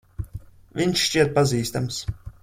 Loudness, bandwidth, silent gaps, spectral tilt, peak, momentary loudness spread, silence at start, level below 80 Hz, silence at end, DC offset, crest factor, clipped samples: -22 LUFS; 16.5 kHz; none; -4.5 dB/octave; -6 dBFS; 17 LU; 0.2 s; -44 dBFS; 0.1 s; under 0.1%; 18 dB; under 0.1%